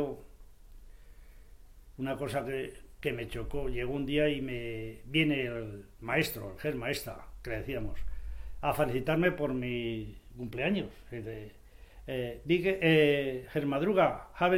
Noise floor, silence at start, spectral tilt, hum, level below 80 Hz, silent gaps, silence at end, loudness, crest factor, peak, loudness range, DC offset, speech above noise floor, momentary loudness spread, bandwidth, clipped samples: -52 dBFS; 0 s; -6 dB/octave; none; -48 dBFS; none; 0 s; -32 LUFS; 20 dB; -12 dBFS; 7 LU; under 0.1%; 21 dB; 17 LU; 16.5 kHz; under 0.1%